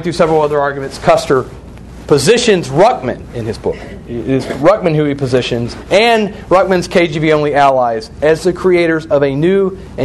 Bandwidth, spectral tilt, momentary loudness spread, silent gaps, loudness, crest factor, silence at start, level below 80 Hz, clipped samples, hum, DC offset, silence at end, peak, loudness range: 12.5 kHz; -5.5 dB/octave; 10 LU; none; -13 LUFS; 12 dB; 0 s; -36 dBFS; under 0.1%; none; under 0.1%; 0 s; 0 dBFS; 2 LU